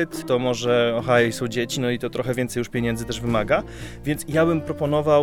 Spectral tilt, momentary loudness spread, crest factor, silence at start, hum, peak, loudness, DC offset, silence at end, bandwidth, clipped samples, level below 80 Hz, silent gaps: -5.5 dB/octave; 7 LU; 18 dB; 0 s; none; -4 dBFS; -23 LUFS; under 0.1%; 0 s; 18 kHz; under 0.1%; -44 dBFS; none